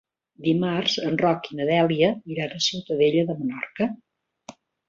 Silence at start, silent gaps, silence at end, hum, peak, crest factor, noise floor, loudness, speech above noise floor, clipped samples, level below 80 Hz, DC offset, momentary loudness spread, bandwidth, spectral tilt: 0.4 s; none; 0.4 s; none; -6 dBFS; 18 dB; -48 dBFS; -24 LUFS; 25 dB; under 0.1%; -64 dBFS; under 0.1%; 8 LU; 7.8 kHz; -5 dB/octave